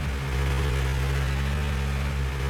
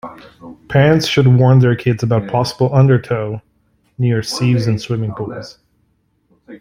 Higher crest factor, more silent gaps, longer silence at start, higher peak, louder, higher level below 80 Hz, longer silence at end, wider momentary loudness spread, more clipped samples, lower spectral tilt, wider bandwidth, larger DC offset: about the same, 10 dB vs 14 dB; neither; about the same, 0 s vs 0.05 s; second, -16 dBFS vs -2 dBFS; second, -27 LUFS vs -15 LUFS; first, -28 dBFS vs -46 dBFS; about the same, 0 s vs 0.05 s; second, 2 LU vs 15 LU; neither; second, -5.5 dB/octave vs -7 dB/octave; first, 15.5 kHz vs 11.5 kHz; neither